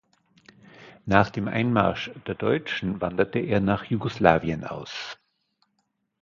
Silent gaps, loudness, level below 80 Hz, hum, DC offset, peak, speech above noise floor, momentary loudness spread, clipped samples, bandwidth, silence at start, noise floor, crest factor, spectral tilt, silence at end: none; -25 LUFS; -50 dBFS; none; under 0.1%; 0 dBFS; 51 dB; 13 LU; under 0.1%; 7.4 kHz; 0.8 s; -75 dBFS; 26 dB; -7 dB/octave; 1.05 s